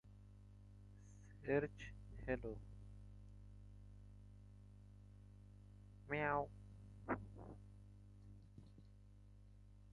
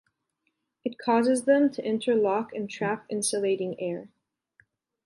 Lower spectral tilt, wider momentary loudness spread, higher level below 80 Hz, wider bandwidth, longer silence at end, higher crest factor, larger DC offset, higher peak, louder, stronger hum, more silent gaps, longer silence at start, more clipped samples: first, -7.5 dB/octave vs -4.5 dB/octave; first, 23 LU vs 12 LU; first, -62 dBFS vs -76 dBFS; about the same, 11 kHz vs 11.5 kHz; second, 0 s vs 1 s; first, 24 dB vs 18 dB; neither; second, -26 dBFS vs -10 dBFS; second, -46 LUFS vs -26 LUFS; first, 50 Hz at -60 dBFS vs none; neither; second, 0.05 s vs 0.85 s; neither